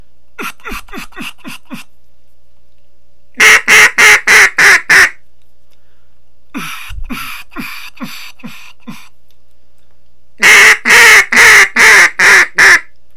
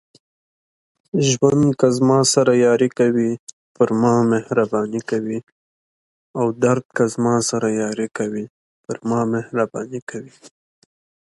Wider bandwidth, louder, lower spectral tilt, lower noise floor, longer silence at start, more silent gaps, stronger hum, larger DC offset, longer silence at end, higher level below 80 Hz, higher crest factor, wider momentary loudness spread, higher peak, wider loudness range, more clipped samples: first, over 20 kHz vs 11.5 kHz; first, -4 LUFS vs -19 LUFS; second, 0 dB/octave vs -5.5 dB/octave; second, -54 dBFS vs under -90 dBFS; second, 0.4 s vs 1.15 s; second, none vs 3.39-3.47 s, 3.53-3.75 s, 5.43-6.34 s, 6.85-6.90 s, 8.50-8.84 s, 10.02-10.07 s; first, 60 Hz at -55 dBFS vs none; first, 5% vs under 0.1%; second, 0.35 s vs 0.75 s; first, -38 dBFS vs -58 dBFS; second, 10 dB vs 20 dB; first, 23 LU vs 15 LU; about the same, 0 dBFS vs 0 dBFS; first, 23 LU vs 7 LU; first, 3% vs under 0.1%